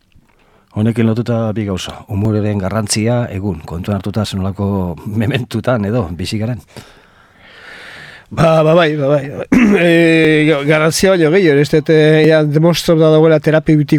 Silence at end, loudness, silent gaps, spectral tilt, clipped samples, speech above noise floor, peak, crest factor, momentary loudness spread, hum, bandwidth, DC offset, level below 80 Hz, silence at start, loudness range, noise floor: 0 s; -13 LUFS; none; -6 dB/octave; under 0.1%; 39 dB; 0 dBFS; 12 dB; 12 LU; none; 15.5 kHz; under 0.1%; -42 dBFS; 0.75 s; 9 LU; -51 dBFS